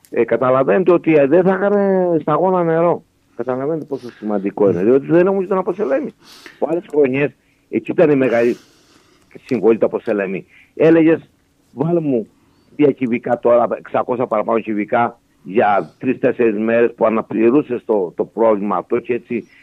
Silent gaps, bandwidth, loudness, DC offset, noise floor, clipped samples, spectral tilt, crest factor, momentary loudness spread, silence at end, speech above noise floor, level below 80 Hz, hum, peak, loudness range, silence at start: none; 7 kHz; -16 LUFS; under 0.1%; -52 dBFS; under 0.1%; -9 dB/octave; 14 dB; 10 LU; 0.2 s; 36 dB; -64 dBFS; none; -2 dBFS; 3 LU; 0.1 s